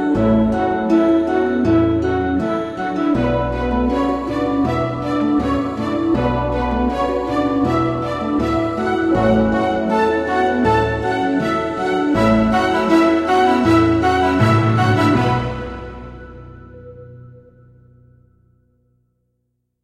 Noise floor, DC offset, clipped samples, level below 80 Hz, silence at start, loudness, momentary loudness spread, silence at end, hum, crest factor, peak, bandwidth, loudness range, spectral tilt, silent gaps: -70 dBFS; under 0.1%; under 0.1%; -34 dBFS; 0 s; -17 LUFS; 6 LU; 2.55 s; none; 16 dB; -2 dBFS; 11.5 kHz; 4 LU; -7.5 dB/octave; none